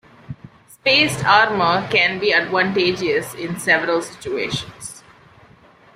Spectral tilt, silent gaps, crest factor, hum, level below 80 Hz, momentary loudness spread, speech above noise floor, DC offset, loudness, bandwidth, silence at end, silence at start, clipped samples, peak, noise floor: -3.5 dB/octave; none; 18 dB; none; -54 dBFS; 20 LU; 31 dB; under 0.1%; -17 LUFS; 16 kHz; 1 s; 0.3 s; under 0.1%; -2 dBFS; -49 dBFS